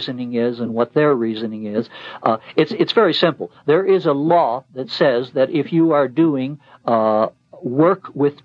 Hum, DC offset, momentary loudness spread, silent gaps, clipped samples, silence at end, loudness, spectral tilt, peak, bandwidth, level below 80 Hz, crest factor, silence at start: none; under 0.1%; 10 LU; none; under 0.1%; 0.1 s; -18 LUFS; -8 dB/octave; -2 dBFS; 7.2 kHz; -70 dBFS; 16 dB; 0 s